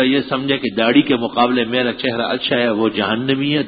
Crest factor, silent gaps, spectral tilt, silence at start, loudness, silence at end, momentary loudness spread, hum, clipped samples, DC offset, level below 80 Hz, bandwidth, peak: 16 dB; none; -10.5 dB/octave; 0 s; -17 LUFS; 0 s; 5 LU; none; under 0.1%; under 0.1%; -54 dBFS; 5 kHz; 0 dBFS